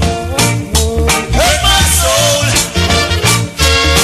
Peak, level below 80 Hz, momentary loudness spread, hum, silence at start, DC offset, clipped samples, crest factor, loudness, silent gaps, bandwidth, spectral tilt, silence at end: 0 dBFS; -18 dBFS; 4 LU; none; 0 s; under 0.1%; 0.1%; 12 dB; -10 LUFS; none; 16 kHz; -3 dB/octave; 0 s